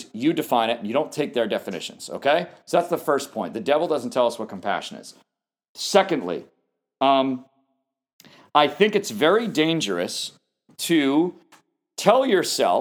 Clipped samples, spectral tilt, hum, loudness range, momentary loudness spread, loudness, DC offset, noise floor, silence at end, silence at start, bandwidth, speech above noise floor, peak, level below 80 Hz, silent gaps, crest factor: under 0.1%; -4 dB/octave; none; 3 LU; 11 LU; -22 LUFS; under 0.1%; -75 dBFS; 0 s; 0 s; over 20 kHz; 53 dB; 0 dBFS; -78 dBFS; 5.69-5.75 s, 8.13-8.19 s; 22 dB